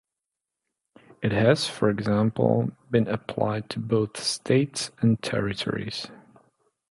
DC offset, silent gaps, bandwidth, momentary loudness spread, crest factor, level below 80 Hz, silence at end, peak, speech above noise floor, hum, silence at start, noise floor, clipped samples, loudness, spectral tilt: under 0.1%; none; 11.5 kHz; 9 LU; 20 dB; -56 dBFS; 0.75 s; -6 dBFS; 62 dB; none; 1.2 s; -87 dBFS; under 0.1%; -25 LUFS; -5.5 dB/octave